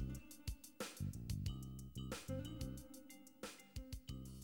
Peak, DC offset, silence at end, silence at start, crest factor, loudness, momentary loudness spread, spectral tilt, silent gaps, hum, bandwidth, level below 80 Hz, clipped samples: -30 dBFS; under 0.1%; 0 s; 0 s; 18 dB; -50 LUFS; 9 LU; -5 dB/octave; none; none; over 20 kHz; -56 dBFS; under 0.1%